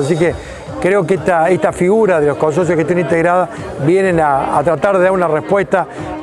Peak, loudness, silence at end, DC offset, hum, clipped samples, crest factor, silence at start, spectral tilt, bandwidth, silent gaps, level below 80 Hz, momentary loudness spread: -2 dBFS; -14 LUFS; 0 s; under 0.1%; none; under 0.1%; 12 dB; 0 s; -7 dB/octave; 12 kHz; none; -42 dBFS; 5 LU